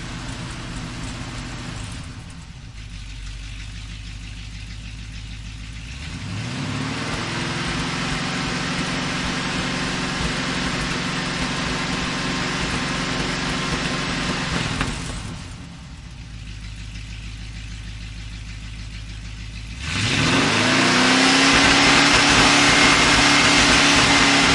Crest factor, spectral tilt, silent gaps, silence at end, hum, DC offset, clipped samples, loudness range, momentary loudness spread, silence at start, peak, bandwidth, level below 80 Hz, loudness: 20 dB; -3 dB/octave; none; 0 s; none; under 0.1%; under 0.1%; 21 LU; 22 LU; 0 s; -2 dBFS; 11.5 kHz; -36 dBFS; -18 LUFS